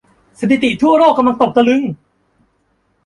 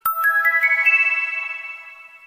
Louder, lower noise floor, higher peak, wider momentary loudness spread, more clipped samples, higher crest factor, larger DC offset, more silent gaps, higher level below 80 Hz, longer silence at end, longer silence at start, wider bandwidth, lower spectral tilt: first, -13 LUFS vs -16 LUFS; first, -61 dBFS vs -41 dBFS; first, -2 dBFS vs -6 dBFS; second, 12 LU vs 17 LU; neither; about the same, 14 dB vs 16 dB; neither; neither; first, -52 dBFS vs -72 dBFS; first, 1.1 s vs 0.1 s; first, 0.4 s vs 0.05 s; second, 11 kHz vs 16 kHz; first, -6 dB/octave vs 1.5 dB/octave